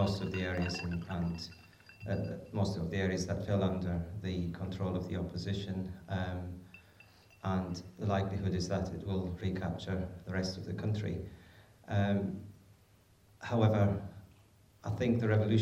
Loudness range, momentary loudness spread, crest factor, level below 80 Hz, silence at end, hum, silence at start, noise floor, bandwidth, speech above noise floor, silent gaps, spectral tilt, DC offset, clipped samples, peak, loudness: 3 LU; 13 LU; 18 dB; -60 dBFS; 0 s; none; 0 s; -64 dBFS; 10 kHz; 30 dB; none; -7 dB/octave; under 0.1%; under 0.1%; -16 dBFS; -35 LUFS